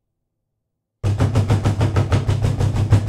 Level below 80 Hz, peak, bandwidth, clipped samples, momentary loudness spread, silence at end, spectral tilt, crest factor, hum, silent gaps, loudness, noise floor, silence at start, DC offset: -32 dBFS; -2 dBFS; 11.5 kHz; under 0.1%; 3 LU; 0 s; -7 dB/octave; 16 dB; none; none; -19 LUFS; -77 dBFS; 1.05 s; under 0.1%